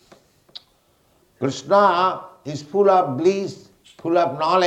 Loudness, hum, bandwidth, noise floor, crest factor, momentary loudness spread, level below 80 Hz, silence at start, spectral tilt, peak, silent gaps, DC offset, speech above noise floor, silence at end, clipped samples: -19 LUFS; none; 9 kHz; -61 dBFS; 18 dB; 16 LU; -68 dBFS; 1.4 s; -5.5 dB/octave; -4 dBFS; none; under 0.1%; 42 dB; 0 s; under 0.1%